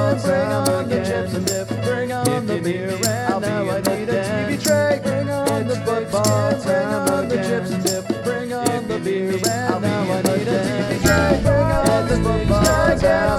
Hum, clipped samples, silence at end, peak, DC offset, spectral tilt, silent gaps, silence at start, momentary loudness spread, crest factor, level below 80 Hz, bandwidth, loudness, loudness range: none; under 0.1%; 0 s; -2 dBFS; under 0.1%; -5 dB/octave; none; 0 s; 6 LU; 16 dB; -34 dBFS; 18 kHz; -19 LUFS; 3 LU